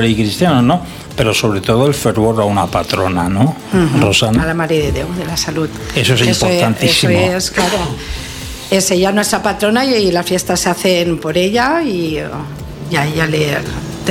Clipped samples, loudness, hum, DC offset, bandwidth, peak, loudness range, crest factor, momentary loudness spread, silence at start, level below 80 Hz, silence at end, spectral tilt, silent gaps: under 0.1%; -14 LUFS; none; under 0.1%; 17 kHz; 0 dBFS; 2 LU; 14 dB; 9 LU; 0 s; -34 dBFS; 0 s; -4.5 dB/octave; none